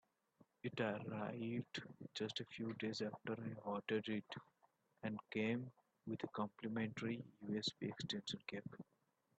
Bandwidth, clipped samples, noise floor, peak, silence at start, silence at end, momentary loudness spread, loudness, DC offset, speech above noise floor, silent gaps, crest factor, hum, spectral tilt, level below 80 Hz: 8.6 kHz; under 0.1%; -79 dBFS; -28 dBFS; 0.4 s; 0.55 s; 9 LU; -46 LUFS; under 0.1%; 33 dB; none; 20 dB; none; -5.5 dB/octave; -82 dBFS